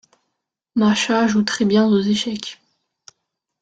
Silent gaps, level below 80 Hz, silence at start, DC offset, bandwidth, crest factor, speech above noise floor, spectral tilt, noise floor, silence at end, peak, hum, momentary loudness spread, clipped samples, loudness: none; -58 dBFS; 0.75 s; under 0.1%; 9 kHz; 16 dB; 61 dB; -4.5 dB/octave; -78 dBFS; 1.1 s; -4 dBFS; none; 10 LU; under 0.1%; -18 LUFS